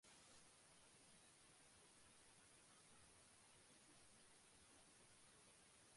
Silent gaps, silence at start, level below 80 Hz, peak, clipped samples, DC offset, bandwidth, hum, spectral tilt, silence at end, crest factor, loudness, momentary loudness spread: none; 0 s; -88 dBFS; -56 dBFS; under 0.1%; under 0.1%; 11.5 kHz; none; -1.5 dB/octave; 0 s; 14 dB; -69 LUFS; 1 LU